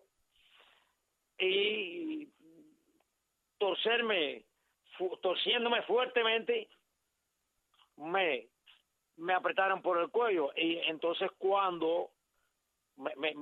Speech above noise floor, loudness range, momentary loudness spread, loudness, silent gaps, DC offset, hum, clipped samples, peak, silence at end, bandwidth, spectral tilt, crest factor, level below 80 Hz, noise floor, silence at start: 50 dB; 5 LU; 12 LU; -32 LUFS; none; under 0.1%; none; under 0.1%; -16 dBFS; 0 s; 4.5 kHz; -5.5 dB/octave; 20 dB; under -90 dBFS; -83 dBFS; 1.4 s